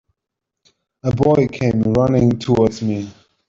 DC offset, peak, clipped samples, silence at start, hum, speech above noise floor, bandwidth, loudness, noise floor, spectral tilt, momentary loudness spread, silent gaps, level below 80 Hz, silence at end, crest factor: under 0.1%; -2 dBFS; under 0.1%; 1.05 s; none; 66 dB; 7.6 kHz; -17 LUFS; -82 dBFS; -8 dB/octave; 10 LU; none; -44 dBFS; 0.4 s; 16 dB